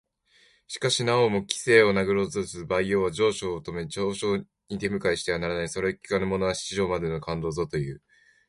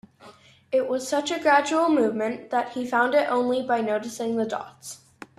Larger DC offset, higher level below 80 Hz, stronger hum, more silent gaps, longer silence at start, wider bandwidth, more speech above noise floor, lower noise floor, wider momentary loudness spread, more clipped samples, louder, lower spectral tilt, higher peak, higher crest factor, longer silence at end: neither; first, -52 dBFS vs -70 dBFS; neither; neither; first, 0.7 s vs 0.25 s; second, 11.5 kHz vs 14 kHz; first, 36 dB vs 27 dB; first, -62 dBFS vs -51 dBFS; about the same, 10 LU vs 11 LU; neither; about the same, -26 LUFS vs -24 LUFS; about the same, -4.5 dB/octave vs -3.5 dB/octave; about the same, -4 dBFS vs -6 dBFS; about the same, 22 dB vs 18 dB; about the same, 0.5 s vs 0.4 s